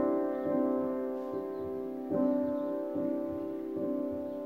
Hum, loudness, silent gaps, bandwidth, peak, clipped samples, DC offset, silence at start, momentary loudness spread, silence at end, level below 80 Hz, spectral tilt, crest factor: none; -34 LUFS; none; 16 kHz; -18 dBFS; under 0.1%; under 0.1%; 0 s; 7 LU; 0 s; -70 dBFS; -9.5 dB/octave; 14 dB